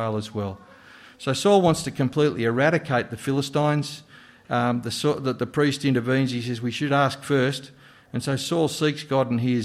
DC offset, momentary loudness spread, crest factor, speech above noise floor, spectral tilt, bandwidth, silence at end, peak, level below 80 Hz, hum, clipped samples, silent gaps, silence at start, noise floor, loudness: under 0.1%; 10 LU; 18 dB; 25 dB; -5.5 dB/octave; 15 kHz; 0 s; -6 dBFS; -60 dBFS; none; under 0.1%; none; 0 s; -48 dBFS; -24 LUFS